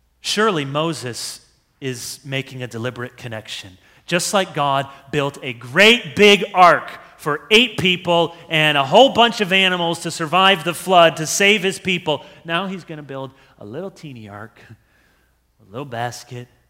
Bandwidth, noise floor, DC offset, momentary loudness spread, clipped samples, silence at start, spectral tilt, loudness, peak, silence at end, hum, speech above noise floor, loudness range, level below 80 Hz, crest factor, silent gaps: 16 kHz; -60 dBFS; under 0.1%; 20 LU; under 0.1%; 0.25 s; -3.5 dB/octave; -16 LUFS; 0 dBFS; 0.25 s; none; 42 dB; 16 LU; -58 dBFS; 18 dB; none